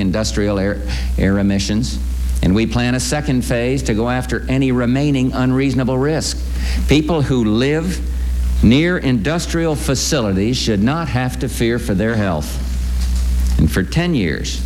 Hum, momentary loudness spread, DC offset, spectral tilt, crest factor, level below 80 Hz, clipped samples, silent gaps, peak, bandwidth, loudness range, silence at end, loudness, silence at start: none; 6 LU; under 0.1%; -5.5 dB/octave; 16 dB; -22 dBFS; under 0.1%; none; 0 dBFS; 17 kHz; 2 LU; 0 s; -17 LUFS; 0 s